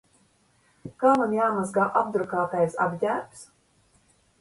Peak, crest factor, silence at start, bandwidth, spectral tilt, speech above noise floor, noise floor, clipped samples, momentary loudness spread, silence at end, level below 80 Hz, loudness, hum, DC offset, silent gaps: -6 dBFS; 20 dB; 0.85 s; 11.5 kHz; -6.5 dB/octave; 40 dB; -64 dBFS; under 0.1%; 14 LU; 0.95 s; -66 dBFS; -25 LUFS; none; under 0.1%; none